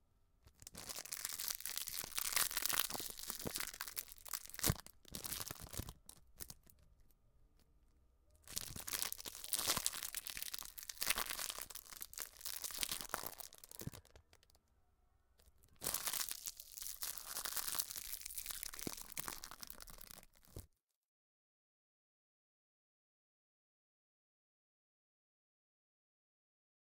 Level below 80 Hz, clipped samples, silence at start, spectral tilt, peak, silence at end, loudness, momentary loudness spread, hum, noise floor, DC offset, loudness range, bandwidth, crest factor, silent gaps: -64 dBFS; under 0.1%; 0.45 s; -1 dB/octave; -12 dBFS; 6.35 s; -42 LUFS; 16 LU; none; -75 dBFS; under 0.1%; 11 LU; 19 kHz; 36 dB; none